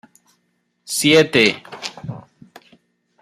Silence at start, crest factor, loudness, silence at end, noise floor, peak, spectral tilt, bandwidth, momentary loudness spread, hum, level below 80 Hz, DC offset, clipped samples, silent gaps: 0.9 s; 20 dB; -16 LUFS; 1 s; -68 dBFS; 0 dBFS; -3.5 dB/octave; 15.5 kHz; 21 LU; none; -62 dBFS; under 0.1%; under 0.1%; none